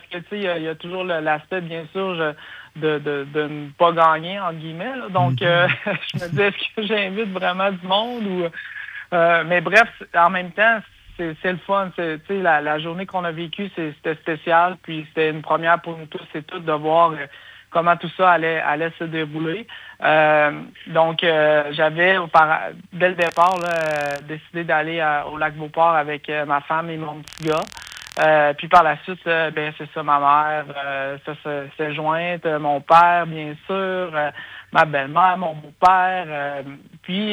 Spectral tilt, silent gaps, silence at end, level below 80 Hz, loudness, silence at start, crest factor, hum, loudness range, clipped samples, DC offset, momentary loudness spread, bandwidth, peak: -5.5 dB/octave; none; 0 s; -60 dBFS; -20 LUFS; 0.1 s; 18 dB; none; 4 LU; under 0.1%; under 0.1%; 13 LU; over 20 kHz; -2 dBFS